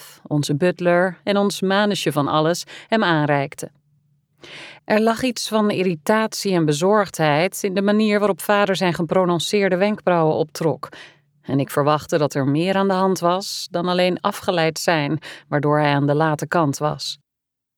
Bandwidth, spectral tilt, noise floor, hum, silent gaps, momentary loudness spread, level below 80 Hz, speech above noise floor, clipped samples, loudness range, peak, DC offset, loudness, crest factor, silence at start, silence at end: over 20 kHz; -5.5 dB/octave; -82 dBFS; none; none; 8 LU; -64 dBFS; 63 dB; under 0.1%; 3 LU; -4 dBFS; under 0.1%; -20 LUFS; 16 dB; 0 s; 0.65 s